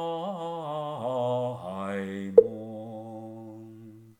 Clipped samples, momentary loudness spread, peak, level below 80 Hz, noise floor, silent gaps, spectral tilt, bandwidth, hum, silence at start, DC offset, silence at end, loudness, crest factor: under 0.1%; 23 LU; -2 dBFS; -68 dBFS; -48 dBFS; none; -7.5 dB/octave; 9.2 kHz; none; 0 s; under 0.1%; 0.1 s; -28 LUFS; 26 dB